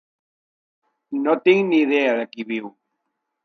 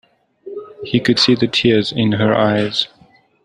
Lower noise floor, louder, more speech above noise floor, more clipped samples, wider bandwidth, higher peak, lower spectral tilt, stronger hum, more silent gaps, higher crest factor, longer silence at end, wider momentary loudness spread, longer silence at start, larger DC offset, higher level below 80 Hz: first, -77 dBFS vs -37 dBFS; second, -20 LUFS vs -15 LUFS; first, 58 dB vs 22 dB; neither; second, 6.4 kHz vs 11 kHz; about the same, -4 dBFS vs -2 dBFS; about the same, -6.5 dB/octave vs -5.5 dB/octave; neither; neither; about the same, 18 dB vs 16 dB; first, 0.75 s vs 0.6 s; second, 13 LU vs 18 LU; first, 1.1 s vs 0.45 s; neither; second, -78 dBFS vs -52 dBFS